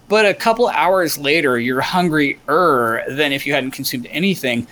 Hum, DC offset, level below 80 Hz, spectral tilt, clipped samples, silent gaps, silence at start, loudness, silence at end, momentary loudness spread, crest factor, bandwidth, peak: none; under 0.1%; -52 dBFS; -4.5 dB/octave; under 0.1%; none; 0.1 s; -16 LUFS; 0.05 s; 5 LU; 14 dB; over 20 kHz; -2 dBFS